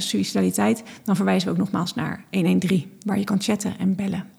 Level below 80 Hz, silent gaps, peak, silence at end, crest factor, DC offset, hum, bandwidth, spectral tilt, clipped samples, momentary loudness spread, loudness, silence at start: -64 dBFS; none; -8 dBFS; 0.1 s; 16 dB; under 0.1%; none; 15 kHz; -5.5 dB/octave; under 0.1%; 6 LU; -23 LUFS; 0 s